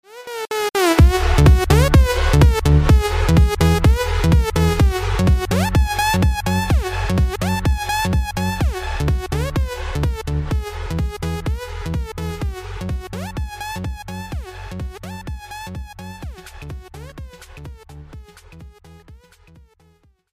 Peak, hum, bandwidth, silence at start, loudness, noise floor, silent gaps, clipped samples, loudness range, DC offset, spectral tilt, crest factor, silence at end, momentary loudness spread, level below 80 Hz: -2 dBFS; none; 15.5 kHz; 0.1 s; -18 LUFS; -56 dBFS; none; under 0.1%; 19 LU; under 0.1%; -6 dB/octave; 16 dB; 1.15 s; 20 LU; -22 dBFS